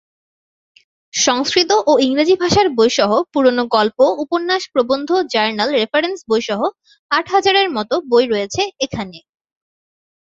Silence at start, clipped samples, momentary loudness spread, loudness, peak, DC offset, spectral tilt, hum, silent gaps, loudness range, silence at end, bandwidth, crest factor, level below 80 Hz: 1.15 s; under 0.1%; 7 LU; -16 LUFS; 0 dBFS; under 0.1%; -3 dB/octave; none; 6.99-7.09 s; 3 LU; 1.05 s; 7.8 kHz; 16 dB; -52 dBFS